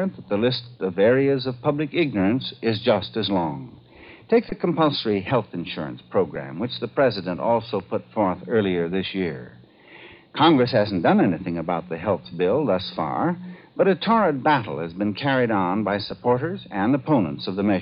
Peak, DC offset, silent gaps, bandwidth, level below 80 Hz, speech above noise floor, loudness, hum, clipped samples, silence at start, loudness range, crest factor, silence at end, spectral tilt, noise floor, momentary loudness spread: -6 dBFS; under 0.1%; none; 5.4 kHz; -58 dBFS; 25 dB; -23 LUFS; none; under 0.1%; 0 s; 3 LU; 16 dB; 0 s; -10.5 dB/octave; -47 dBFS; 10 LU